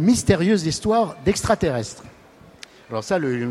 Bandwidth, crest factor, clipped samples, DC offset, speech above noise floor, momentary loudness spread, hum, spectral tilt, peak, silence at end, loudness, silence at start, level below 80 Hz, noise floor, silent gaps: 15.5 kHz; 18 dB; under 0.1%; under 0.1%; 28 dB; 13 LU; none; -5.5 dB/octave; -2 dBFS; 0 s; -21 LUFS; 0 s; -44 dBFS; -48 dBFS; none